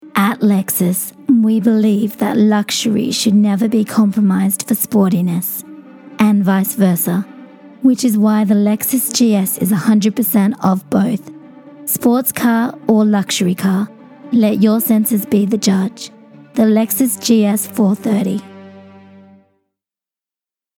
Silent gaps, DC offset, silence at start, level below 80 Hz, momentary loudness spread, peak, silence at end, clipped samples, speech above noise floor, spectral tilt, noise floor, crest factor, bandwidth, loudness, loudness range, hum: none; under 0.1%; 0.05 s; -62 dBFS; 6 LU; 0 dBFS; 2 s; under 0.1%; 76 dB; -5.5 dB/octave; -90 dBFS; 14 dB; 20 kHz; -14 LUFS; 2 LU; none